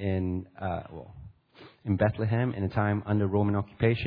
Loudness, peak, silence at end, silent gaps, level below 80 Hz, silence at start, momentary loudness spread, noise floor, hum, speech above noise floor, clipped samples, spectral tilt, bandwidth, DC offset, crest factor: -29 LUFS; -10 dBFS; 0 s; none; -54 dBFS; 0 s; 15 LU; -54 dBFS; none; 27 dB; under 0.1%; -11 dB/octave; 5 kHz; under 0.1%; 18 dB